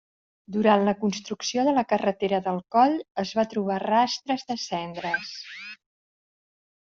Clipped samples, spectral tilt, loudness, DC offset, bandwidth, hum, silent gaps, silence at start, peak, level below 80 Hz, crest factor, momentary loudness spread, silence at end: under 0.1%; -3.5 dB/octave; -25 LUFS; under 0.1%; 7.6 kHz; none; 3.11-3.15 s; 0.5 s; -6 dBFS; -68 dBFS; 20 dB; 11 LU; 1.1 s